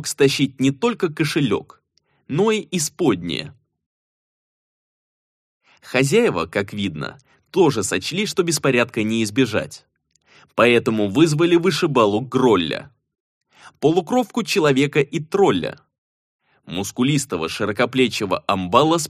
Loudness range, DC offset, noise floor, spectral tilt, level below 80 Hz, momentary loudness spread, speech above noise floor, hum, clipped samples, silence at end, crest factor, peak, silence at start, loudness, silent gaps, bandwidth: 6 LU; under 0.1%; -59 dBFS; -5 dB/octave; -58 dBFS; 10 LU; 40 dB; none; under 0.1%; 0 s; 20 dB; 0 dBFS; 0 s; -19 LUFS; 3.86-5.61 s, 13.20-13.41 s, 15.98-16.39 s; 15 kHz